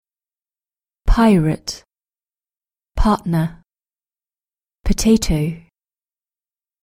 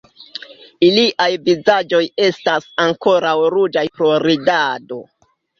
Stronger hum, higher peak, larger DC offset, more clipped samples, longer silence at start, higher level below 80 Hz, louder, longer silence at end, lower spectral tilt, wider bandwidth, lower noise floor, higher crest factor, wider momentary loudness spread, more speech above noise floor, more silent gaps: neither; about the same, -2 dBFS vs 0 dBFS; neither; neither; first, 1.05 s vs 0.2 s; first, -26 dBFS vs -60 dBFS; second, -18 LUFS vs -15 LUFS; first, 1.25 s vs 0.55 s; about the same, -6 dB/octave vs -5 dB/octave; first, 16 kHz vs 7.2 kHz; first, under -90 dBFS vs -36 dBFS; about the same, 18 dB vs 16 dB; about the same, 18 LU vs 18 LU; first, over 74 dB vs 21 dB; neither